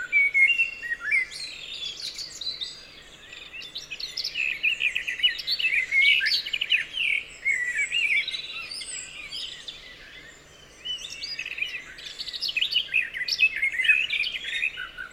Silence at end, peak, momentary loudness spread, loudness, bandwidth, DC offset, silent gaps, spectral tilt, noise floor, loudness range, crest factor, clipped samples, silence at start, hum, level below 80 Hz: 0 s; -6 dBFS; 19 LU; -24 LUFS; 16.5 kHz; under 0.1%; none; 1.5 dB/octave; -50 dBFS; 11 LU; 20 dB; under 0.1%; 0 s; none; -60 dBFS